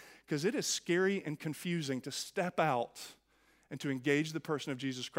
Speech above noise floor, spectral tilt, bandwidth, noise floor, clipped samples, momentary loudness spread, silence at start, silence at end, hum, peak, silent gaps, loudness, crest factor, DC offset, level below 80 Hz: 35 dB; -4.5 dB/octave; 16 kHz; -70 dBFS; under 0.1%; 10 LU; 0 s; 0 s; none; -16 dBFS; none; -35 LUFS; 20 dB; under 0.1%; -78 dBFS